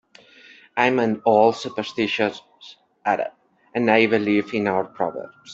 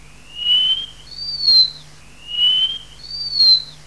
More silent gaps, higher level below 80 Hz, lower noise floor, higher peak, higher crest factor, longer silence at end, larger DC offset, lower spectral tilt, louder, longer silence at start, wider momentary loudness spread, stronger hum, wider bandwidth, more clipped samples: neither; second, -66 dBFS vs -50 dBFS; first, -49 dBFS vs -43 dBFS; about the same, -2 dBFS vs -4 dBFS; first, 20 dB vs 14 dB; about the same, 0 s vs 0.1 s; second, under 0.1% vs 0.7%; first, -5.5 dB/octave vs -0.5 dB/octave; second, -21 LUFS vs -14 LUFS; first, 0.75 s vs 0.3 s; second, 13 LU vs 17 LU; neither; second, 8 kHz vs 11 kHz; neither